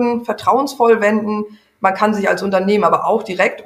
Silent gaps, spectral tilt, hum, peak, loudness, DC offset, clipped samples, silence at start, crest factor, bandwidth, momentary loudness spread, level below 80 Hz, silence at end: none; -5.5 dB/octave; none; 0 dBFS; -16 LUFS; under 0.1%; under 0.1%; 0 s; 14 dB; 15.5 kHz; 6 LU; -62 dBFS; 0 s